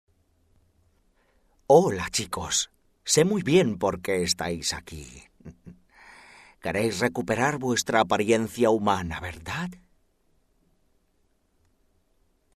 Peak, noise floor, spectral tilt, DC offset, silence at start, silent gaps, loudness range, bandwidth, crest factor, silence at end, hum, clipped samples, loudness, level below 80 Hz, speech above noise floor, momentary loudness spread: -4 dBFS; -68 dBFS; -4 dB/octave; under 0.1%; 1.7 s; none; 7 LU; 14 kHz; 24 dB; 2.85 s; none; under 0.1%; -25 LUFS; -54 dBFS; 44 dB; 14 LU